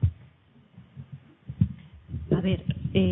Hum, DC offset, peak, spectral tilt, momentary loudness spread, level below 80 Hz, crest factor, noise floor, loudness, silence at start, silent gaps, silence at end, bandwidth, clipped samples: none; under 0.1%; -8 dBFS; -11.5 dB/octave; 21 LU; -44 dBFS; 20 dB; -57 dBFS; -29 LUFS; 0 s; none; 0 s; 3.9 kHz; under 0.1%